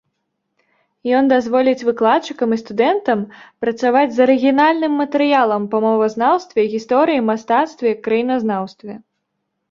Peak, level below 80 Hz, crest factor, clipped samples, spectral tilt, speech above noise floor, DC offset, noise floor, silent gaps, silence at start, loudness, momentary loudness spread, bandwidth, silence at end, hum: -2 dBFS; -64 dBFS; 16 dB; under 0.1%; -6 dB/octave; 58 dB; under 0.1%; -74 dBFS; none; 1.05 s; -16 LUFS; 8 LU; 7.4 kHz; 0.75 s; none